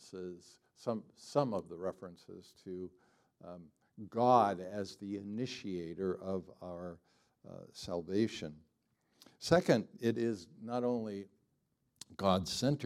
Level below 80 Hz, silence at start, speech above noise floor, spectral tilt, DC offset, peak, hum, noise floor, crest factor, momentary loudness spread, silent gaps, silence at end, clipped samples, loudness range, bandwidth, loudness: -72 dBFS; 0 s; 44 dB; -6 dB/octave; under 0.1%; -12 dBFS; none; -80 dBFS; 26 dB; 23 LU; none; 0 s; under 0.1%; 7 LU; 15 kHz; -36 LUFS